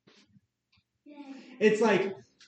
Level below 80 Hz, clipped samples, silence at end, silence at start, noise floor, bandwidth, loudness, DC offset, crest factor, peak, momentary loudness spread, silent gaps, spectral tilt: -84 dBFS; under 0.1%; 0.3 s; 1.1 s; -73 dBFS; 8.8 kHz; -27 LUFS; under 0.1%; 20 dB; -10 dBFS; 23 LU; none; -5.5 dB/octave